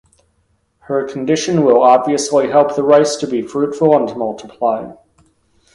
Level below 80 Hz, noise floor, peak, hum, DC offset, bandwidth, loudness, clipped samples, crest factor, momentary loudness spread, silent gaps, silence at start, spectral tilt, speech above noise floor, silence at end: -56 dBFS; -62 dBFS; 0 dBFS; none; under 0.1%; 11.5 kHz; -15 LUFS; under 0.1%; 16 dB; 11 LU; none; 0.9 s; -5 dB/octave; 48 dB; 0.8 s